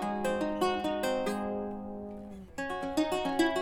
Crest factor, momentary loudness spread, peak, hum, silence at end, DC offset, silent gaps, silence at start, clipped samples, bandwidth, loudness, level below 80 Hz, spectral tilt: 18 dB; 12 LU; -14 dBFS; none; 0 s; under 0.1%; none; 0 s; under 0.1%; 18 kHz; -32 LUFS; -56 dBFS; -4.5 dB/octave